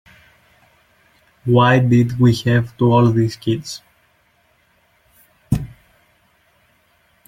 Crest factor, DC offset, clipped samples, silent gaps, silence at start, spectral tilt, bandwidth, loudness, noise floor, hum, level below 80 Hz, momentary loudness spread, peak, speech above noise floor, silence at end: 18 dB; under 0.1%; under 0.1%; none; 1.45 s; -7 dB/octave; 12 kHz; -16 LUFS; -59 dBFS; none; -46 dBFS; 15 LU; -2 dBFS; 45 dB; 1.6 s